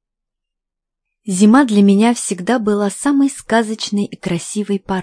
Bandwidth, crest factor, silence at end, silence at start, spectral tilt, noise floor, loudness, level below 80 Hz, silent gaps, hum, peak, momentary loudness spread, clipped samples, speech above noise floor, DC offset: 10.5 kHz; 16 dB; 0 s; 1.25 s; -5 dB/octave; -81 dBFS; -15 LUFS; -54 dBFS; none; none; 0 dBFS; 10 LU; under 0.1%; 66 dB; under 0.1%